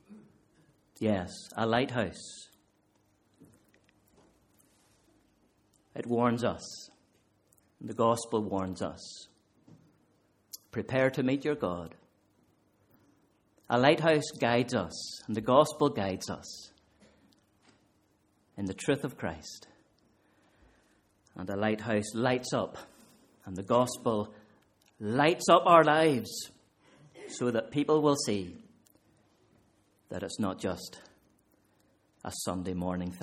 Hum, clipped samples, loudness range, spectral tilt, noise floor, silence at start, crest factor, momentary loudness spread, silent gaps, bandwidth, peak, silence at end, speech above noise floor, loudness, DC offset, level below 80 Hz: none; under 0.1%; 12 LU; -5 dB/octave; -70 dBFS; 0.1 s; 26 dB; 21 LU; none; 15.5 kHz; -6 dBFS; 0 s; 41 dB; -30 LUFS; under 0.1%; -66 dBFS